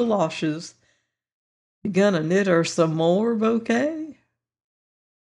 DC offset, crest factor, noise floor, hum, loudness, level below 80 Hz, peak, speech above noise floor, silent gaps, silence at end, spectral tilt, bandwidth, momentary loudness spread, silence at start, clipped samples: under 0.1%; 16 dB; -69 dBFS; none; -22 LUFS; -70 dBFS; -6 dBFS; 48 dB; 1.33-1.82 s; 1.25 s; -6 dB/octave; 11 kHz; 14 LU; 0 s; under 0.1%